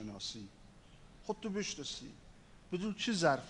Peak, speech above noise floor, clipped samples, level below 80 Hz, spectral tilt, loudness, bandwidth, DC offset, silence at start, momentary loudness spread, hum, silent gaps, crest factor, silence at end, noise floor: -16 dBFS; 21 dB; under 0.1%; -62 dBFS; -4 dB/octave; -39 LUFS; 10.5 kHz; under 0.1%; 0 s; 20 LU; none; none; 24 dB; 0 s; -58 dBFS